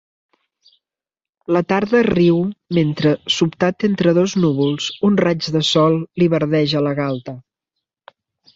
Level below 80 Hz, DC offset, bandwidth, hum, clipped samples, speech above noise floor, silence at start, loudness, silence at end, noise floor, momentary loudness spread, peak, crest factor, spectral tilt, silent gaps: -54 dBFS; under 0.1%; 7.8 kHz; none; under 0.1%; 73 dB; 1.5 s; -17 LUFS; 1.15 s; -89 dBFS; 6 LU; -2 dBFS; 16 dB; -6 dB/octave; none